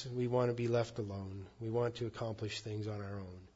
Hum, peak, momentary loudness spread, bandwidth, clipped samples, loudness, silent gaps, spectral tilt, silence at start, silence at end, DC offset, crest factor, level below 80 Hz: none; -20 dBFS; 11 LU; 7.6 kHz; under 0.1%; -38 LUFS; none; -6.5 dB/octave; 0 s; 0.1 s; under 0.1%; 18 dB; -66 dBFS